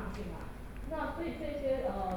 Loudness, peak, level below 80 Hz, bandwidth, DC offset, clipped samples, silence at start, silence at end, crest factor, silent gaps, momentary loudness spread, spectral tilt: -38 LUFS; -22 dBFS; -46 dBFS; 19.5 kHz; under 0.1%; under 0.1%; 0 s; 0 s; 14 dB; none; 12 LU; -7 dB/octave